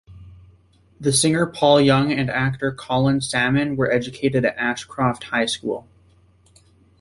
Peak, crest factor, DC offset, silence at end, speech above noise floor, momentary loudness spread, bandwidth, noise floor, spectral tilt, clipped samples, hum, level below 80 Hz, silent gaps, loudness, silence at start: -2 dBFS; 18 dB; under 0.1%; 1.2 s; 35 dB; 8 LU; 11.5 kHz; -55 dBFS; -4.5 dB/octave; under 0.1%; none; -50 dBFS; none; -20 LUFS; 0.1 s